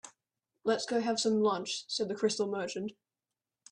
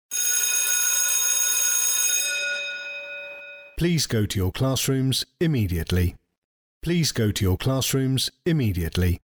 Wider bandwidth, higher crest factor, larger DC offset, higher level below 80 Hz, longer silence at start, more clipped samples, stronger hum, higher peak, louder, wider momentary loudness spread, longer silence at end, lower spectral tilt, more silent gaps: second, 10.5 kHz vs over 20 kHz; about the same, 16 dB vs 14 dB; neither; second, -78 dBFS vs -42 dBFS; about the same, 0.05 s vs 0.1 s; neither; neither; second, -18 dBFS vs -10 dBFS; second, -32 LUFS vs -22 LUFS; about the same, 10 LU vs 12 LU; first, 0.8 s vs 0.1 s; about the same, -3.5 dB/octave vs -3.5 dB/octave; second, none vs 6.38-6.81 s